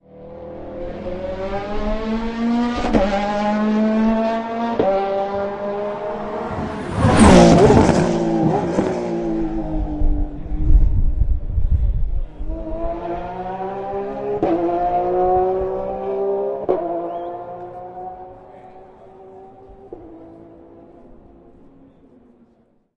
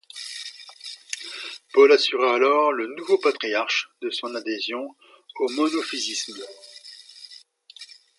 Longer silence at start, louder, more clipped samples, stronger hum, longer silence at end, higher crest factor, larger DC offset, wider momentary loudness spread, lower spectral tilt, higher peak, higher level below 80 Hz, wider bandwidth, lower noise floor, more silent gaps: about the same, 0.15 s vs 0.15 s; first, -19 LUFS vs -23 LUFS; neither; neither; first, 2.1 s vs 0.35 s; about the same, 18 dB vs 20 dB; neither; second, 16 LU vs 24 LU; first, -7 dB/octave vs -1 dB/octave; first, 0 dBFS vs -4 dBFS; first, -26 dBFS vs -84 dBFS; about the same, 11 kHz vs 11.5 kHz; first, -58 dBFS vs -49 dBFS; neither